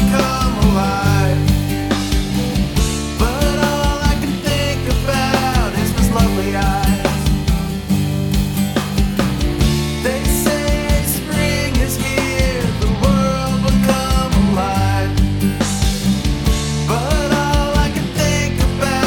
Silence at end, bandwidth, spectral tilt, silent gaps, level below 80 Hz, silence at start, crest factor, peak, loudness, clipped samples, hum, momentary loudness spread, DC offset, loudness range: 0 s; 19 kHz; -5 dB/octave; none; -22 dBFS; 0 s; 14 dB; -2 dBFS; -17 LUFS; under 0.1%; none; 3 LU; under 0.1%; 1 LU